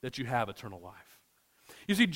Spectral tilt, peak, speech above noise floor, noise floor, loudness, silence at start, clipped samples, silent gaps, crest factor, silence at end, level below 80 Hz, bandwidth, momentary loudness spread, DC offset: -5 dB/octave; -12 dBFS; 35 dB; -68 dBFS; -34 LUFS; 0.05 s; under 0.1%; none; 22 dB; 0 s; -66 dBFS; 16 kHz; 23 LU; under 0.1%